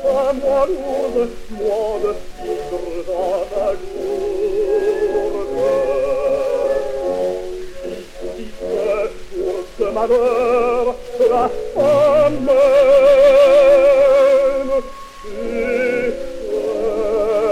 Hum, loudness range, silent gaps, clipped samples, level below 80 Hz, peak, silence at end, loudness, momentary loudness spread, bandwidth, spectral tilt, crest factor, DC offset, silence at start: none; 10 LU; none; under 0.1%; -38 dBFS; -2 dBFS; 0 s; -16 LUFS; 16 LU; 13 kHz; -5 dB/octave; 14 dB; under 0.1%; 0 s